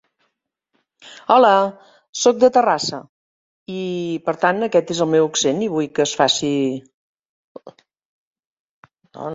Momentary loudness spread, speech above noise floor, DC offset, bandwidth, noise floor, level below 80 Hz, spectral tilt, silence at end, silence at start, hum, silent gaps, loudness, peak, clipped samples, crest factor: 16 LU; 56 dB; under 0.1%; 7.8 kHz; -74 dBFS; -64 dBFS; -3.5 dB/octave; 0 s; 1.05 s; none; 2.09-2.13 s, 3.09-3.66 s, 6.94-7.55 s, 8.05-8.35 s, 8.45-8.83 s; -18 LUFS; -2 dBFS; under 0.1%; 20 dB